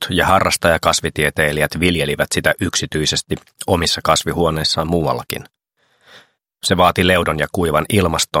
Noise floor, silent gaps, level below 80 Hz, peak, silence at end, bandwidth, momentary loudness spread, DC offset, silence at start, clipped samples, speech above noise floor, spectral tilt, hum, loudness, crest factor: -62 dBFS; none; -38 dBFS; 0 dBFS; 0 s; 16.5 kHz; 7 LU; under 0.1%; 0 s; under 0.1%; 45 dB; -3.5 dB/octave; none; -16 LUFS; 18 dB